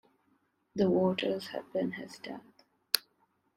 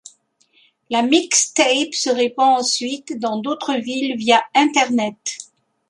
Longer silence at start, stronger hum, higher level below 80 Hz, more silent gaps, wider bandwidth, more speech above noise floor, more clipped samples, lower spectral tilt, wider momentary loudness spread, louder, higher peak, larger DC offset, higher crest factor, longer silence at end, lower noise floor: second, 0.75 s vs 0.9 s; neither; about the same, -72 dBFS vs -70 dBFS; neither; first, 16 kHz vs 11.5 kHz; about the same, 42 dB vs 41 dB; neither; first, -5 dB/octave vs -1.5 dB/octave; first, 16 LU vs 10 LU; second, -32 LUFS vs -18 LUFS; about the same, -2 dBFS vs -2 dBFS; neither; first, 32 dB vs 18 dB; about the same, 0.55 s vs 0.45 s; first, -74 dBFS vs -59 dBFS